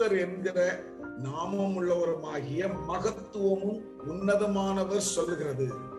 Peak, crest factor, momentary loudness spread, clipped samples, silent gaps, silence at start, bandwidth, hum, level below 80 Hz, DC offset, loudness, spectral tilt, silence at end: -14 dBFS; 16 dB; 8 LU; under 0.1%; none; 0 s; 12.5 kHz; none; -58 dBFS; under 0.1%; -30 LUFS; -5 dB/octave; 0 s